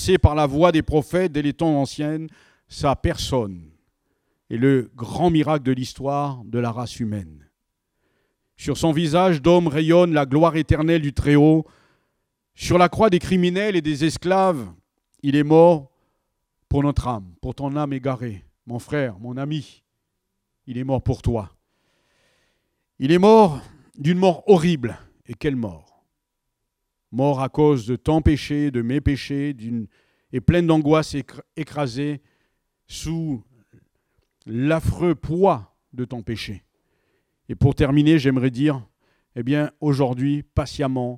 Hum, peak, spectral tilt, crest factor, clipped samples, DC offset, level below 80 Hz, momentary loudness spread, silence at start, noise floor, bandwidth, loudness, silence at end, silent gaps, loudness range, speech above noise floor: none; 0 dBFS; -7 dB/octave; 20 dB; under 0.1%; under 0.1%; -40 dBFS; 16 LU; 0 s; -78 dBFS; 14.5 kHz; -20 LUFS; 0 s; none; 9 LU; 58 dB